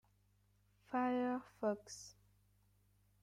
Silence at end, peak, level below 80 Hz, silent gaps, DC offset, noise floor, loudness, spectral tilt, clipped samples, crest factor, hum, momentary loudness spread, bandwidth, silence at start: 1.1 s; -28 dBFS; -78 dBFS; none; under 0.1%; -75 dBFS; -41 LUFS; -5 dB/octave; under 0.1%; 18 dB; 50 Hz at -70 dBFS; 16 LU; 13.5 kHz; 0.9 s